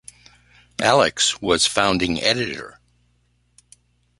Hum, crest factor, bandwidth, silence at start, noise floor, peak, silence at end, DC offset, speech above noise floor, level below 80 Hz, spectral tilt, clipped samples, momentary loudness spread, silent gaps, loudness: 60 Hz at -45 dBFS; 22 dB; 11.5 kHz; 0.8 s; -64 dBFS; 0 dBFS; 1.5 s; under 0.1%; 44 dB; -50 dBFS; -2.5 dB/octave; under 0.1%; 16 LU; none; -19 LUFS